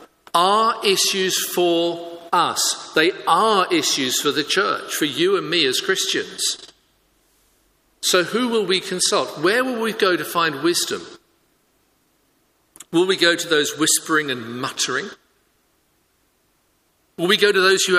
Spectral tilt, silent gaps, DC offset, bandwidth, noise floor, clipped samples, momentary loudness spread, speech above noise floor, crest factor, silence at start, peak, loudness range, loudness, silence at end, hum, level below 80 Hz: -2 dB/octave; none; under 0.1%; 15.5 kHz; -64 dBFS; under 0.1%; 7 LU; 45 dB; 20 dB; 0 s; 0 dBFS; 5 LU; -19 LUFS; 0 s; none; -68 dBFS